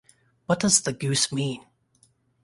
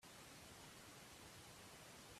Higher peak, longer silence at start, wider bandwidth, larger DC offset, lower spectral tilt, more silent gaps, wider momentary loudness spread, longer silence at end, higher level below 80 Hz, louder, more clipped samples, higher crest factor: first, -4 dBFS vs -48 dBFS; first, 0.5 s vs 0 s; second, 11.5 kHz vs 15.5 kHz; neither; about the same, -3 dB/octave vs -2.5 dB/octave; neither; first, 16 LU vs 0 LU; first, 0.85 s vs 0 s; first, -60 dBFS vs -76 dBFS; first, -23 LUFS vs -59 LUFS; neither; first, 22 dB vs 12 dB